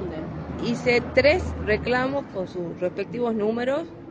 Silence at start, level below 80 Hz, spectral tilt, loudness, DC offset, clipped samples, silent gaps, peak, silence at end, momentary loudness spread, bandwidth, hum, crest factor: 0 s; -42 dBFS; -6 dB/octave; -24 LUFS; under 0.1%; under 0.1%; none; -6 dBFS; 0 s; 12 LU; 9.2 kHz; none; 20 dB